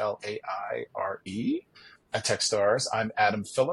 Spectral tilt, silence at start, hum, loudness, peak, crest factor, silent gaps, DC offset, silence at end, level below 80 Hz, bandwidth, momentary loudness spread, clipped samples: -3.5 dB/octave; 0 s; none; -29 LUFS; -10 dBFS; 18 dB; none; under 0.1%; 0 s; -68 dBFS; 12 kHz; 10 LU; under 0.1%